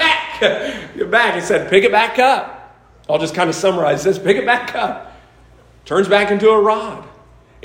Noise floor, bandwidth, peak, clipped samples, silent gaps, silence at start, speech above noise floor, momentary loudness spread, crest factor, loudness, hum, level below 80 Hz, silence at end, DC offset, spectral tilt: -46 dBFS; 16 kHz; 0 dBFS; under 0.1%; none; 0 s; 31 dB; 11 LU; 16 dB; -15 LUFS; none; -50 dBFS; 0.55 s; under 0.1%; -4 dB/octave